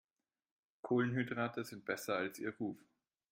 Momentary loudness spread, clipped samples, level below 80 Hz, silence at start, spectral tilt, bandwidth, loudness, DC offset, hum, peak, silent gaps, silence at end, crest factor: 9 LU; under 0.1%; -82 dBFS; 0.85 s; -6 dB/octave; 16.5 kHz; -39 LUFS; under 0.1%; none; -22 dBFS; none; 0.55 s; 18 dB